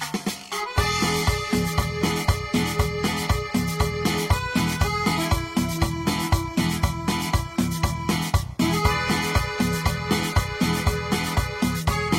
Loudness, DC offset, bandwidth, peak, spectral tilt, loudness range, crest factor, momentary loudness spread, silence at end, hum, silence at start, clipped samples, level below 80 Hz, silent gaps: -24 LUFS; under 0.1%; 16.5 kHz; -6 dBFS; -4.5 dB/octave; 1 LU; 18 dB; 3 LU; 0 s; none; 0 s; under 0.1%; -32 dBFS; none